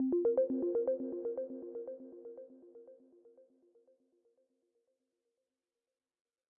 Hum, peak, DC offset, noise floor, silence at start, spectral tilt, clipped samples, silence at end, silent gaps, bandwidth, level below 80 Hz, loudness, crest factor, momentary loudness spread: none; -22 dBFS; under 0.1%; under -90 dBFS; 0 s; -6.5 dB/octave; under 0.1%; 3.2 s; none; 2 kHz; -82 dBFS; -36 LUFS; 18 dB; 24 LU